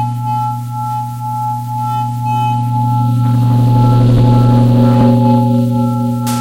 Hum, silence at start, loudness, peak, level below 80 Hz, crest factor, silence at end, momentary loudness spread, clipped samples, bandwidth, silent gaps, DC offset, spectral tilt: none; 0 s; -12 LUFS; 0 dBFS; -34 dBFS; 10 dB; 0 s; 10 LU; under 0.1%; 15.5 kHz; none; under 0.1%; -8.5 dB/octave